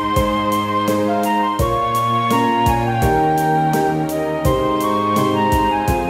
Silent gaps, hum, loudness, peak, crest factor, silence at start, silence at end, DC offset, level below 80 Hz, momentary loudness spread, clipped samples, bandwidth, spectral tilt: none; none; -17 LUFS; -4 dBFS; 14 dB; 0 s; 0 s; under 0.1%; -32 dBFS; 2 LU; under 0.1%; 16 kHz; -6 dB/octave